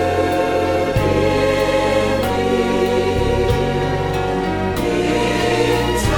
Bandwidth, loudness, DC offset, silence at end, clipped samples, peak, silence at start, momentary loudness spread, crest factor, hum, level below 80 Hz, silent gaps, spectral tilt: 18 kHz; -17 LUFS; under 0.1%; 0 s; under 0.1%; -4 dBFS; 0 s; 3 LU; 14 dB; none; -30 dBFS; none; -5.5 dB/octave